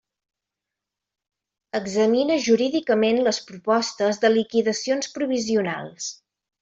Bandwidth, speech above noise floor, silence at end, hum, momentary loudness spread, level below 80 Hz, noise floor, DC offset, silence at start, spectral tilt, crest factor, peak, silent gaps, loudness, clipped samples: 8 kHz; 64 dB; 0.45 s; none; 10 LU; -68 dBFS; -86 dBFS; under 0.1%; 1.75 s; -4 dB/octave; 18 dB; -6 dBFS; none; -22 LUFS; under 0.1%